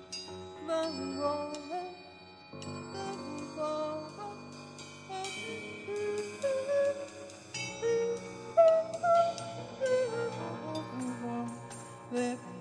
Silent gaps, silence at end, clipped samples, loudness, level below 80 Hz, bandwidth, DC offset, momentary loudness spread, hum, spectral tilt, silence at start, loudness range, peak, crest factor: none; 0 s; under 0.1%; -34 LUFS; -74 dBFS; 10.5 kHz; under 0.1%; 17 LU; none; -4.5 dB/octave; 0 s; 10 LU; -14 dBFS; 20 dB